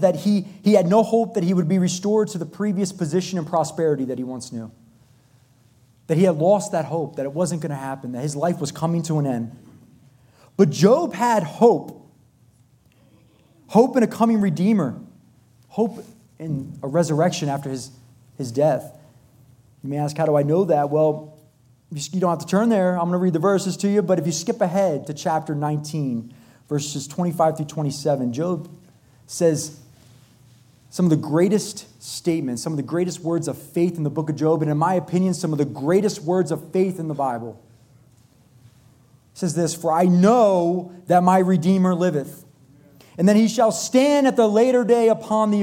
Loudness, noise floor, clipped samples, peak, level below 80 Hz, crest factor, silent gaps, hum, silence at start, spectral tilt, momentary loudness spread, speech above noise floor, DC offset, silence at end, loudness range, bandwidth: -21 LUFS; -56 dBFS; under 0.1%; -2 dBFS; -66 dBFS; 18 dB; none; none; 0 s; -6.5 dB/octave; 13 LU; 36 dB; under 0.1%; 0 s; 6 LU; 16.5 kHz